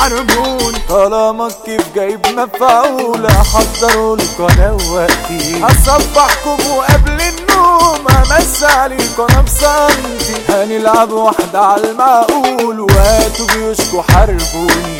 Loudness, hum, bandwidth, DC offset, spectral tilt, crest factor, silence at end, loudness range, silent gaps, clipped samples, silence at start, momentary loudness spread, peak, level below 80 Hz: -10 LUFS; none; 17.5 kHz; under 0.1%; -4 dB/octave; 10 dB; 0 s; 2 LU; none; 0.7%; 0 s; 6 LU; 0 dBFS; -18 dBFS